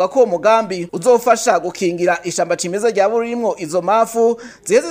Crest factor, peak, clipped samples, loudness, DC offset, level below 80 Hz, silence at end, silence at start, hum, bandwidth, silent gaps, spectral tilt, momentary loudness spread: 16 dB; 0 dBFS; under 0.1%; -16 LUFS; under 0.1%; -62 dBFS; 0 s; 0 s; none; 16 kHz; none; -4 dB/octave; 7 LU